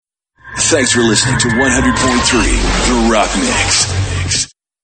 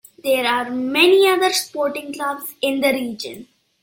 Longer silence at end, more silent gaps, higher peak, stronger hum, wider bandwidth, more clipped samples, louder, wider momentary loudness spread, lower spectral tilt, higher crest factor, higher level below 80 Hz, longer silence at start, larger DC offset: about the same, 0.35 s vs 0.4 s; neither; about the same, 0 dBFS vs -2 dBFS; neither; second, 9.2 kHz vs 17 kHz; neither; first, -12 LUFS vs -18 LUFS; second, 5 LU vs 12 LU; about the same, -3 dB/octave vs -2 dB/octave; about the same, 14 dB vs 18 dB; first, -24 dBFS vs -66 dBFS; first, 0.45 s vs 0.25 s; neither